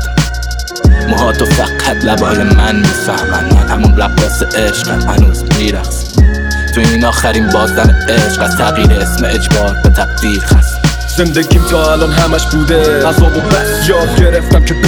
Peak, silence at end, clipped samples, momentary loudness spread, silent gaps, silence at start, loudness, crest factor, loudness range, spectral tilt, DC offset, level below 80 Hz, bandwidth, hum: 0 dBFS; 0 s; under 0.1%; 4 LU; none; 0 s; -10 LUFS; 8 dB; 1 LU; -5 dB/octave; under 0.1%; -14 dBFS; 19.5 kHz; none